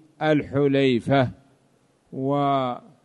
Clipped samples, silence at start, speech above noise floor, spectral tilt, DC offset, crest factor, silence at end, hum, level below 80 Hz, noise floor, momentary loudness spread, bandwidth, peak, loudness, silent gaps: under 0.1%; 0.2 s; 41 dB; -8 dB/octave; under 0.1%; 14 dB; 0.25 s; none; -58 dBFS; -62 dBFS; 10 LU; 10 kHz; -8 dBFS; -23 LUFS; none